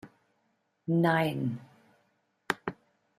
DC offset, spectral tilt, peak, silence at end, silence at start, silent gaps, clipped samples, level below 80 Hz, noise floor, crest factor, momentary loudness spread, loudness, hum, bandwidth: under 0.1%; -7 dB/octave; -8 dBFS; 0.45 s; 0.05 s; none; under 0.1%; -72 dBFS; -75 dBFS; 26 dB; 16 LU; -30 LUFS; none; 14.5 kHz